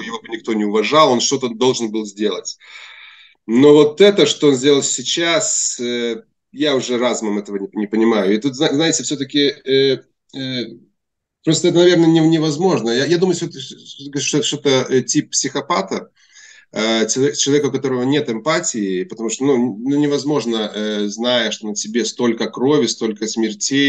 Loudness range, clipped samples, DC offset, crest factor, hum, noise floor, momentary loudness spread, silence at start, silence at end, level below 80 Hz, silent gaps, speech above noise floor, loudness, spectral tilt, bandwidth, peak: 4 LU; under 0.1%; under 0.1%; 16 dB; none; -76 dBFS; 13 LU; 0 s; 0 s; -68 dBFS; none; 60 dB; -16 LUFS; -4 dB/octave; 9.4 kHz; 0 dBFS